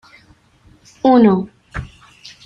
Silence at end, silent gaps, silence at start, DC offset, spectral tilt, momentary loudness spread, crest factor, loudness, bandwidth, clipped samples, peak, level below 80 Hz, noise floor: 0.6 s; none; 1.05 s; under 0.1%; -8 dB/octave; 20 LU; 16 dB; -14 LUFS; 7.4 kHz; under 0.1%; -2 dBFS; -42 dBFS; -51 dBFS